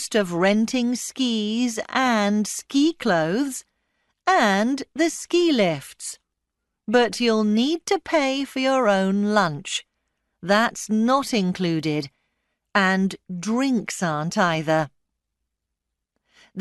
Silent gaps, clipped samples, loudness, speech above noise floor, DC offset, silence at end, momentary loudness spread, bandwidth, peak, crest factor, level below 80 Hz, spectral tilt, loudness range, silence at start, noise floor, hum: none; under 0.1%; -22 LUFS; 61 dB; under 0.1%; 0 s; 10 LU; 12.5 kHz; -4 dBFS; 18 dB; -64 dBFS; -4.5 dB/octave; 2 LU; 0 s; -82 dBFS; none